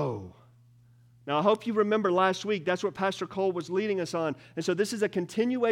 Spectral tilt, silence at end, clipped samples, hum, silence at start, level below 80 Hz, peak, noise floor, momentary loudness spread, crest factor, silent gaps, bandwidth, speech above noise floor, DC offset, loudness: -5.5 dB/octave; 0 s; under 0.1%; none; 0 s; -74 dBFS; -10 dBFS; -58 dBFS; 8 LU; 18 dB; none; 15.5 kHz; 31 dB; under 0.1%; -28 LUFS